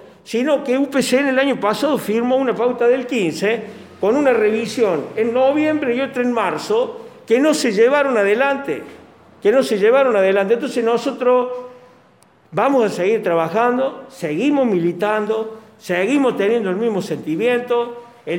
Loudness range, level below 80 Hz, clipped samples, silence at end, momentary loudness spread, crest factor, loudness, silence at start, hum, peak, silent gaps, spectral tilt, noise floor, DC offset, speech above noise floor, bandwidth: 2 LU; -66 dBFS; under 0.1%; 0 s; 9 LU; 14 dB; -18 LUFS; 0 s; none; -4 dBFS; none; -5 dB/octave; -52 dBFS; under 0.1%; 35 dB; 17 kHz